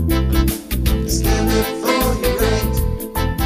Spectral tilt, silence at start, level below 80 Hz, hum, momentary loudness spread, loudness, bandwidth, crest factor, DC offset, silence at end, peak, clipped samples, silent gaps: -5 dB/octave; 0 s; -22 dBFS; none; 5 LU; -18 LUFS; 16 kHz; 14 dB; under 0.1%; 0 s; -2 dBFS; under 0.1%; none